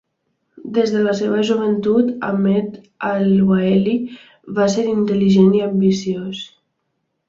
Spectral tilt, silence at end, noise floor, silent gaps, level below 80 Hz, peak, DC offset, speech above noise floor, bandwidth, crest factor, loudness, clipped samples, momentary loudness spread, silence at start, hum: -7 dB/octave; 0.8 s; -72 dBFS; none; -56 dBFS; -2 dBFS; under 0.1%; 56 dB; 7.6 kHz; 16 dB; -17 LUFS; under 0.1%; 12 LU; 0.65 s; none